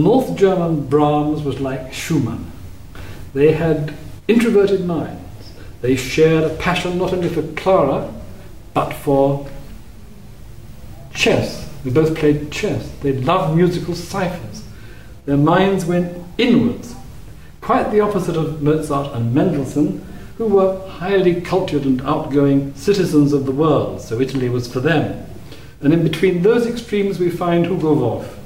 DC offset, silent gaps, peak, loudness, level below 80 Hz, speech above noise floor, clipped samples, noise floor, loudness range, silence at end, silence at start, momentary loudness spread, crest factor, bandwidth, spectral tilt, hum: 1%; none; -2 dBFS; -17 LUFS; -40 dBFS; 22 dB; under 0.1%; -38 dBFS; 3 LU; 0 s; 0 s; 16 LU; 16 dB; 16 kHz; -6.5 dB/octave; none